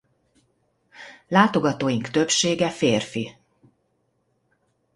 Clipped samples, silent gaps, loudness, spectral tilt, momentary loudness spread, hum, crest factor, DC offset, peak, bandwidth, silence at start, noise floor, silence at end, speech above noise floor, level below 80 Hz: under 0.1%; none; -21 LUFS; -4 dB/octave; 21 LU; none; 24 dB; under 0.1%; -2 dBFS; 11.5 kHz; 1 s; -70 dBFS; 1.65 s; 49 dB; -62 dBFS